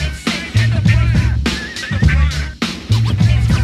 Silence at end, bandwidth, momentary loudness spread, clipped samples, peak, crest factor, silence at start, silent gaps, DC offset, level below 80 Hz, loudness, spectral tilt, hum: 0 s; 12.5 kHz; 8 LU; under 0.1%; -2 dBFS; 14 dB; 0 s; none; under 0.1%; -20 dBFS; -16 LUFS; -5.5 dB/octave; none